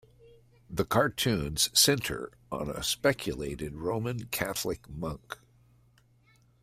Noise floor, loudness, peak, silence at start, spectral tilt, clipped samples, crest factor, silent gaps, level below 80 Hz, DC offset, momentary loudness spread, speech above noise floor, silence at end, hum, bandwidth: -64 dBFS; -29 LUFS; -10 dBFS; 0.25 s; -3 dB/octave; under 0.1%; 22 dB; none; -52 dBFS; under 0.1%; 15 LU; 34 dB; 1.3 s; none; 16 kHz